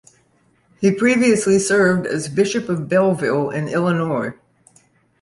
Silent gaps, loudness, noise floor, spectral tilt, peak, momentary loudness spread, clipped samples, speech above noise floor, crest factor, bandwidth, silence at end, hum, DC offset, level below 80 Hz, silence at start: none; -18 LUFS; -59 dBFS; -5.5 dB/octave; -4 dBFS; 7 LU; under 0.1%; 42 dB; 16 dB; 11.5 kHz; 0.9 s; none; under 0.1%; -58 dBFS; 0.8 s